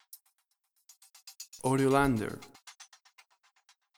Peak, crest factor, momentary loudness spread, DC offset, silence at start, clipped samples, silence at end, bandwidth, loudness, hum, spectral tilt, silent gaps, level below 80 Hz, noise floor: -12 dBFS; 22 dB; 28 LU; under 0.1%; 1.25 s; under 0.1%; 1.15 s; 20 kHz; -29 LUFS; none; -6 dB/octave; none; -56 dBFS; -77 dBFS